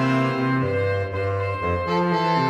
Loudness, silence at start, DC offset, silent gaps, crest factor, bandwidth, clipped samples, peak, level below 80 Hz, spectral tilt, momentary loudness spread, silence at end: -23 LUFS; 0 s; under 0.1%; none; 12 dB; 10 kHz; under 0.1%; -10 dBFS; -48 dBFS; -7.5 dB/octave; 4 LU; 0 s